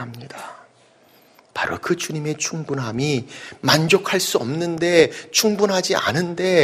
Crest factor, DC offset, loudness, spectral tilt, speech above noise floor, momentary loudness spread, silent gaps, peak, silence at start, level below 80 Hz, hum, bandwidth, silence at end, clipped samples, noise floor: 20 dB; under 0.1%; -20 LUFS; -4 dB/octave; 34 dB; 17 LU; none; 0 dBFS; 0 s; -58 dBFS; none; 15.5 kHz; 0 s; under 0.1%; -54 dBFS